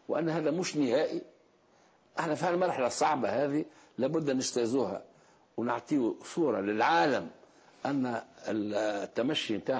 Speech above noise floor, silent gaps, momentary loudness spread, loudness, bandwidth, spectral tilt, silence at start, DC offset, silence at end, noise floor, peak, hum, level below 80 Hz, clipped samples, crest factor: 34 dB; none; 8 LU; -31 LUFS; 8 kHz; -4.5 dB/octave; 0.1 s; under 0.1%; 0 s; -64 dBFS; -16 dBFS; none; -74 dBFS; under 0.1%; 16 dB